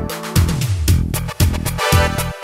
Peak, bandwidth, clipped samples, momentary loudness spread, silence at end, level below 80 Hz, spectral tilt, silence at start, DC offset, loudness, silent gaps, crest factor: 0 dBFS; 16.5 kHz; under 0.1%; 4 LU; 0 s; -24 dBFS; -4.5 dB/octave; 0 s; under 0.1%; -17 LUFS; none; 16 dB